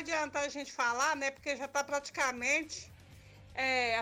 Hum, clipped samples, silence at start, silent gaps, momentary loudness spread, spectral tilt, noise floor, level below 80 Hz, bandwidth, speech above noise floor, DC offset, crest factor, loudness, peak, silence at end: none; under 0.1%; 0 s; none; 12 LU; -1.5 dB/octave; -55 dBFS; -66 dBFS; 19 kHz; 21 dB; under 0.1%; 16 dB; -33 LUFS; -20 dBFS; 0 s